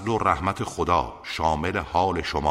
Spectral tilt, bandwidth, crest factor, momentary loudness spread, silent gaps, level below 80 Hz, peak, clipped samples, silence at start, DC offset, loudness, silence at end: -5.5 dB/octave; 15.5 kHz; 18 dB; 4 LU; none; -40 dBFS; -6 dBFS; under 0.1%; 0 s; under 0.1%; -25 LUFS; 0 s